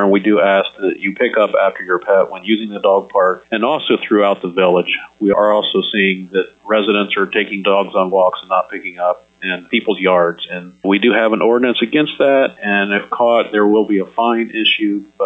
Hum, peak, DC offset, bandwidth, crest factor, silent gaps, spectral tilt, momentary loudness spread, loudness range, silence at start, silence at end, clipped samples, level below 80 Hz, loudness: none; -2 dBFS; under 0.1%; 4 kHz; 12 dB; none; -7.5 dB/octave; 6 LU; 2 LU; 0 s; 0 s; under 0.1%; -62 dBFS; -15 LUFS